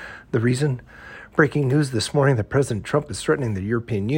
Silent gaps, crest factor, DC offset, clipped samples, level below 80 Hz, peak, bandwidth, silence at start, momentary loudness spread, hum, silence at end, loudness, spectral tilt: none; 18 dB; under 0.1%; under 0.1%; -50 dBFS; -4 dBFS; 16.5 kHz; 0 s; 7 LU; none; 0 s; -22 LUFS; -6 dB/octave